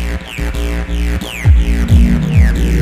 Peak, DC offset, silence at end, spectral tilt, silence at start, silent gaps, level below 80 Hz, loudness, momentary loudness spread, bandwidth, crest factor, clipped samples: 0 dBFS; under 0.1%; 0 s; -6.5 dB/octave; 0 s; none; -14 dBFS; -14 LUFS; 9 LU; 15 kHz; 12 dB; under 0.1%